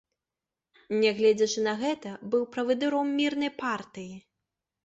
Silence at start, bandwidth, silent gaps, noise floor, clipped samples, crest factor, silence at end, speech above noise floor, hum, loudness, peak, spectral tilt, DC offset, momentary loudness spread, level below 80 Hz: 0.9 s; 8 kHz; none; -90 dBFS; under 0.1%; 16 dB; 0.65 s; 62 dB; none; -27 LUFS; -12 dBFS; -4 dB/octave; under 0.1%; 12 LU; -72 dBFS